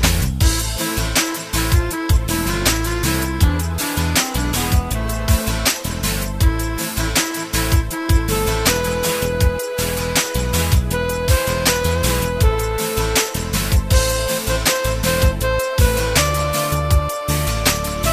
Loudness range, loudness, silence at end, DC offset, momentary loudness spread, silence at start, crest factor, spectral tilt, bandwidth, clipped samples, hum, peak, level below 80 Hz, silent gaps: 1 LU; -18 LUFS; 0 s; under 0.1%; 4 LU; 0 s; 16 dB; -4 dB/octave; 15.5 kHz; under 0.1%; none; 0 dBFS; -22 dBFS; none